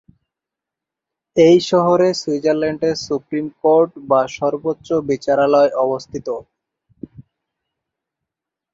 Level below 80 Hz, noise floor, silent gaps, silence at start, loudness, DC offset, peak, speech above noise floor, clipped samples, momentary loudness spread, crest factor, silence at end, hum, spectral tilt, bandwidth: -58 dBFS; -85 dBFS; none; 1.35 s; -17 LUFS; under 0.1%; -2 dBFS; 69 dB; under 0.1%; 12 LU; 16 dB; 1.5 s; none; -6 dB/octave; 7.8 kHz